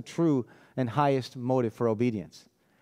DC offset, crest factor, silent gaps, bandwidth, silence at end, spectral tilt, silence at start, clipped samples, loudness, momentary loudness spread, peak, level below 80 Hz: under 0.1%; 18 dB; none; 14.5 kHz; 0.4 s; -7.5 dB/octave; 0 s; under 0.1%; -28 LUFS; 11 LU; -12 dBFS; -72 dBFS